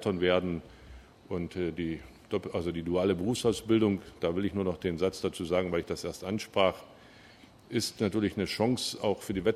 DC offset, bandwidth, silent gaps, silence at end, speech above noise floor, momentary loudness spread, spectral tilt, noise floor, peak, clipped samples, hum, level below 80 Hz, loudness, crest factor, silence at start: under 0.1%; 15 kHz; none; 0 s; 25 dB; 9 LU; -5.5 dB/octave; -55 dBFS; -10 dBFS; under 0.1%; none; -56 dBFS; -31 LUFS; 22 dB; 0 s